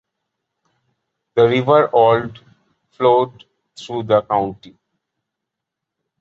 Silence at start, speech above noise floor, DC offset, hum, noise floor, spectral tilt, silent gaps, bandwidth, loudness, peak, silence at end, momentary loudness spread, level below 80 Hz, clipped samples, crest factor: 1.35 s; 66 dB; under 0.1%; none; -82 dBFS; -7 dB/octave; none; 7.6 kHz; -16 LUFS; -2 dBFS; 1.65 s; 14 LU; -56 dBFS; under 0.1%; 18 dB